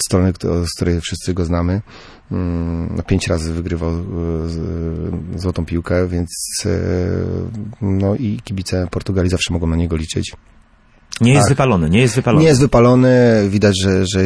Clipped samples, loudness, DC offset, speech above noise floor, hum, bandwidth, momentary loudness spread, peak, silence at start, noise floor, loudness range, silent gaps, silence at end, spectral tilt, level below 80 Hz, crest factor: under 0.1%; -17 LUFS; under 0.1%; 34 dB; none; 11 kHz; 12 LU; -2 dBFS; 0 s; -50 dBFS; 8 LU; none; 0 s; -6 dB/octave; -32 dBFS; 14 dB